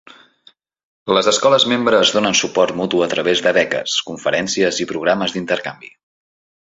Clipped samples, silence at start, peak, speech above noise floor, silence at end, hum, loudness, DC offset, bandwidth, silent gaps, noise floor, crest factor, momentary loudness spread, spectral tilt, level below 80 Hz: under 0.1%; 1.05 s; 0 dBFS; 36 dB; 0.9 s; none; -16 LUFS; under 0.1%; 8.2 kHz; none; -53 dBFS; 18 dB; 7 LU; -3 dB/octave; -58 dBFS